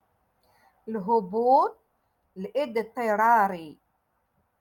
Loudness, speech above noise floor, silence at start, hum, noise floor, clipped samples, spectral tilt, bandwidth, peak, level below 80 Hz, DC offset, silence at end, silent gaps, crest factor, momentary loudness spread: -25 LUFS; 49 dB; 0.85 s; none; -73 dBFS; under 0.1%; -6.5 dB/octave; 17.5 kHz; -8 dBFS; -74 dBFS; under 0.1%; 0.85 s; none; 18 dB; 16 LU